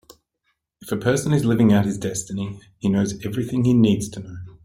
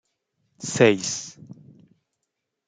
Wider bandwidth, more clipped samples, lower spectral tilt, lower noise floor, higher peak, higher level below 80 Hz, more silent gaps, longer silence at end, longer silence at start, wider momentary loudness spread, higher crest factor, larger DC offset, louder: first, 16 kHz vs 9.6 kHz; neither; first, -6.5 dB/octave vs -4 dB/octave; second, -73 dBFS vs -81 dBFS; about the same, -4 dBFS vs -4 dBFS; first, -52 dBFS vs -68 dBFS; neither; second, 0.15 s vs 1.15 s; first, 0.8 s vs 0.6 s; second, 14 LU vs 18 LU; second, 16 dB vs 24 dB; neither; about the same, -21 LUFS vs -22 LUFS